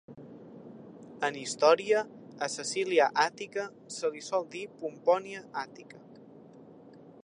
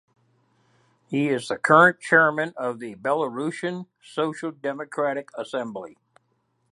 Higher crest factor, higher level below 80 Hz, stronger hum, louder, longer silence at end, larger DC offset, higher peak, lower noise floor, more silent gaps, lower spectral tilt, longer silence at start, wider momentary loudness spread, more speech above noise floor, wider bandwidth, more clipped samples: about the same, 22 dB vs 24 dB; second, -82 dBFS vs -74 dBFS; neither; second, -30 LUFS vs -23 LUFS; second, 0.3 s vs 0.8 s; neither; second, -10 dBFS vs -2 dBFS; second, -53 dBFS vs -71 dBFS; neither; second, -2.5 dB/octave vs -5.5 dB/octave; second, 0.1 s vs 1.1 s; first, 24 LU vs 16 LU; second, 23 dB vs 47 dB; about the same, 11 kHz vs 11.5 kHz; neither